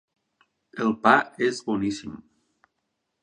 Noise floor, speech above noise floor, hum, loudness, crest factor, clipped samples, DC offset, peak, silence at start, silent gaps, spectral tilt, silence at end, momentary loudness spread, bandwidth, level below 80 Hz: -79 dBFS; 55 dB; none; -24 LUFS; 24 dB; under 0.1%; under 0.1%; -2 dBFS; 0.75 s; none; -5 dB/octave; 1.05 s; 22 LU; 10 kHz; -62 dBFS